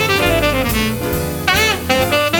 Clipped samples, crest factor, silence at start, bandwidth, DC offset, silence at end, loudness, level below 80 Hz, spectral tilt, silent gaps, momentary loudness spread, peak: under 0.1%; 16 dB; 0 s; 19.5 kHz; under 0.1%; 0 s; -15 LUFS; -30 dBFS; -4 dB/octave; none; 5 LU; 0 dBFS